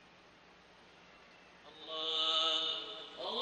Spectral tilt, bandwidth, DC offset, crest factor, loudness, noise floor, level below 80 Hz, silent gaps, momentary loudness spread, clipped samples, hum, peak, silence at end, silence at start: -1 dB/octave; 9.8 kHz; under 0.1%; 20 dB; -34 LUFS; -61 dBFS; -80 dBFS; none; 18 LU; under 0.1%; none; -20 dBFS; 0 s; 0 s